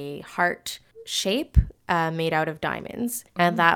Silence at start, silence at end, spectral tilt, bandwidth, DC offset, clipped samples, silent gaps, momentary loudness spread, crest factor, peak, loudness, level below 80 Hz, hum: 0 s; 0 s; -4.5 dB/octave; over 20 kHz; under 0.1%; under 0.1%; none; 9 LU; 22 dB; -2 dBFS; -25 LUFS; -32 dBFS; none